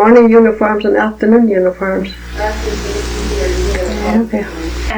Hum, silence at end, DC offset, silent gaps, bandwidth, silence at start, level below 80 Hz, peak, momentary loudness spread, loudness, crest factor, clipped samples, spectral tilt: none; 0 s; under 0.1%; none; over 20 kHz; 0 s; -24 dBFS; 0 dBFS; 11 LU; -13 LUFS; 12 dB; under 0.1%; -6 dB/octave